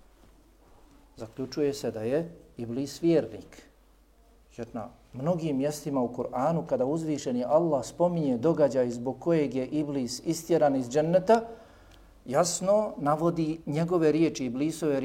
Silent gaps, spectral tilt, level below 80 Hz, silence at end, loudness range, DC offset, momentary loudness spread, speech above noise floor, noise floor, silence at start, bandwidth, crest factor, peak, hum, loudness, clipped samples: none; -6 dB/octave; -60 dBFS; 0 s; 6 LU; under 0.1%; 14 LU; 32 dB; -60 dBFS; 1.15 s; 16.5 kHz; 18 dB; -10 dBFS; none; -28 LUFS; under 0.1%